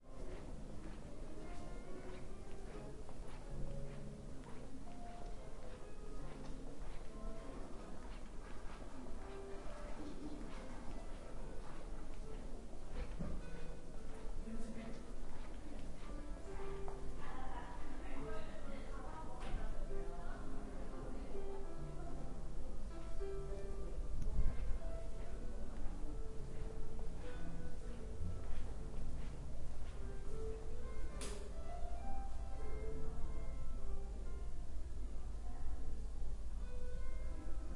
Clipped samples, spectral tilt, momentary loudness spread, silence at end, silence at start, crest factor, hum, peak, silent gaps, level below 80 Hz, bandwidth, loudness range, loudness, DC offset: under 0.1%; -6.5 dB/octave; 5 LU; 0 s; 0 s; 18 dB; none; -22 dBFS; none; -46 dBFS; 11 kHz; 5 LU; -51 LUFS; under 0.1%